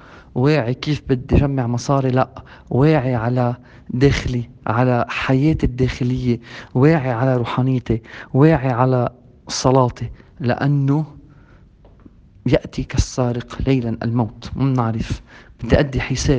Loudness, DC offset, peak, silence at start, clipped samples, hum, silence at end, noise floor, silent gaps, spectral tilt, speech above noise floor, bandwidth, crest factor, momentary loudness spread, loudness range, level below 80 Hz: -19 LUFS; under 0.1%; 0 dBFS; 0.1 s; under 0.1%; none; 0 s; -47 dBFS; none; -7 dB/octave; 29 dB; 8.6 kHz; 18 dB; 10 LU; 4 LU; -34 dBFS